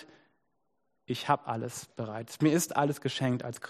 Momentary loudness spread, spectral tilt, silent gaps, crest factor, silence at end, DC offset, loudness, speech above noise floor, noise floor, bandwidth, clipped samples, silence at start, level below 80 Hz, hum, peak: 12 LU; -5 dB/octave; none; 22 dB; 0 s; under 0.1%; -31 LUFS; 49 dB; -80 dBFS; 15 kHz; under 0.1%; 0 s; -72 dBFS; none; -10 dBFS